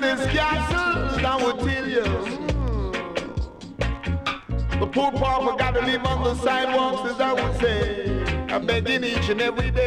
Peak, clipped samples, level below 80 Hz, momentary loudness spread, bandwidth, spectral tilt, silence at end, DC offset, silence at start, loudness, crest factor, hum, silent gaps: -10 dBFS; under 0.1%; -32 dBFS; 6 LU; 12 kHz; -5.5 dB/octave; 0 s; under 0.1%; 0 s; -23 LUFS; 14 dB; none; none